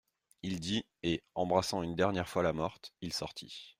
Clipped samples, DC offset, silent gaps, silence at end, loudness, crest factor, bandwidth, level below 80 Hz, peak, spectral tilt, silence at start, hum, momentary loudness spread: under 0.1%; under 0.1%; none; 0.1 s; -35 LUFS; 22 dB; 16 kHz; -62 dBFS; -14 dBFS; -5 dB/octave; 0.45 s; none; 11 LU